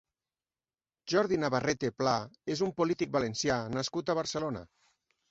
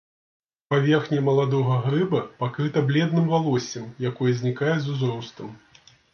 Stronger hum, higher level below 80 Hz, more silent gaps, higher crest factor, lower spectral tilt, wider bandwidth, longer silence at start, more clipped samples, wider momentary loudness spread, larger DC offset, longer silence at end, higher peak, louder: neither; about the same, -64 dBFS vs -66 dBFS; neither; about the same, 20 dB vs 16 dB; second, -4.5 dB/octave vs -7 dB/octave; first, 8.2 kHz vs 6.8 kHz; first, 1.05 s vs 0.7 s; neither; about the same, 7 LU vs 9 LU; neither; about the same, 0.65 s vs 0.55 s; second, -14 dBFS vs -6 dBFS; second, -31 LUFS vs -23 LUFS